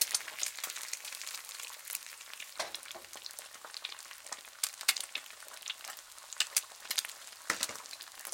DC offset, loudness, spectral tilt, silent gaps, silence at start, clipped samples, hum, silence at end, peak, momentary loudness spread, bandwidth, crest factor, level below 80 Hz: under 0.1%; -38 LUFS; 2.5 dB/octave; none; 0 s; under 0.1%; none; 0 s; -6 dBFS; 14 LU; 17 kHz; 34 dB; -86 dBFS